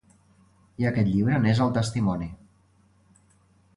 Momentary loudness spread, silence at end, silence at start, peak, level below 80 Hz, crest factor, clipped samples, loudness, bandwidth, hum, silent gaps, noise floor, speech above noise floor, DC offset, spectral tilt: 8 LU; 1.4 s; 0.8 s; -10 dBFS; -50 dBFS; 18 dB; under 0.1%; -24 LUFS; 11.5 kHz; none; none; -61 dBFS; 38 dB; under 0.1%; -7 dB/octave